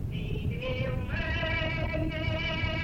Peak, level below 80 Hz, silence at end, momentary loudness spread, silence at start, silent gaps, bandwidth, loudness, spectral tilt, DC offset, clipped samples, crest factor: -18 dBFS; -38 dBFS; 0 s; 4 LU; 0 s; none; 16 kHz; -31 LUFS; -7 dB/octave; under 0.1%; under 0.1%; 14 dB